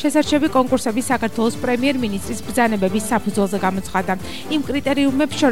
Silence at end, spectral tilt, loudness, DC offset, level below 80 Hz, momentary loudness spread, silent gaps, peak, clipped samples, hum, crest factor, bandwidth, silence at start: 0 s; -4.5 dB/octave; -20 LUFS; 2%; -44 dBFS; 7 LU; none; -4 dBFS; under 0.1%; none; 16 dB; 16.5 kHz; 0 s